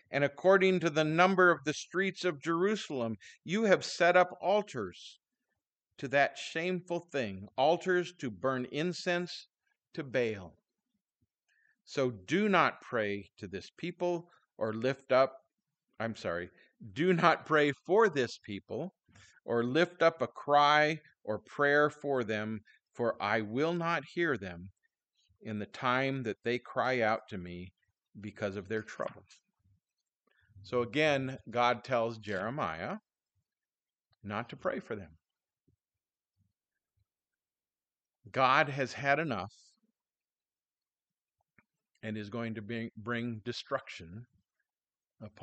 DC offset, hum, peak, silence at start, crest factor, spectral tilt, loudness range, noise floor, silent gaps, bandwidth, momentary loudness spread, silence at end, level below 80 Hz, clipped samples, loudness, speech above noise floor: under 0.1%; none; -10 dBFS; 0.1 s; 24 dB; -5.5 dB/octave; 12 LU; under -90 dBFS; none; 8.8 kHz; 17 LU; 0.15 s; -74 dBFS; under 0.1%; -32 LUFS; over 58 dB